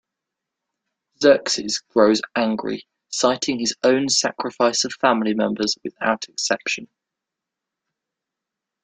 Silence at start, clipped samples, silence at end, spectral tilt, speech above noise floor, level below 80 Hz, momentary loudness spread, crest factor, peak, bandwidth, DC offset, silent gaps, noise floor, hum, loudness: 1.2 s; under 0.1%; 2 s; -2.5 dB/octave; 65 dB; -64 dBFS; 8 LU; 20 dB; -2 dBFS; 9.6 kHz; under 0.1%; none; -85 dBFS; none; -20 LUFS